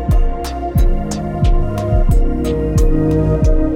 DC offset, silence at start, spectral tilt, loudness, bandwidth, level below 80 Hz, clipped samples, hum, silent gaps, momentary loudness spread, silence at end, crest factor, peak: under 0.1%; 0 s; -8 dB/octave; -17 LUFS; 15 kHz; -14 dBFS; under 0.1%; none; none; 6 LU; 0 s; 12 dB; -2 dBFS